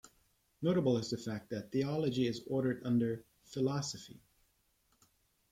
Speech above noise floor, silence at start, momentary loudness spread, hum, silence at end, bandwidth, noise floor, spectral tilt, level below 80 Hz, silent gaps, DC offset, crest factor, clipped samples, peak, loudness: 40 dB; 0.05 s; 11 LU; none; 1.35 s; 15.5 kHz; -75 dBFS; -6.5 dB/octave; -72 dBFS; none; under 0.1%; 16 dB; under 0.1%; -20 dBFS; -35 LUFS